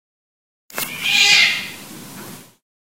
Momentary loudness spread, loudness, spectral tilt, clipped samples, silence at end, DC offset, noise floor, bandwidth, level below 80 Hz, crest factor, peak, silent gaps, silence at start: 24 LU; -14 LUFS; 0.5 dB/octave; under 0.1%; 0.55 s; 0.2%; -38 dBFS; 16 kHz; -66 dBFS; 20 dB; 0 dBFS; none; 0.75 s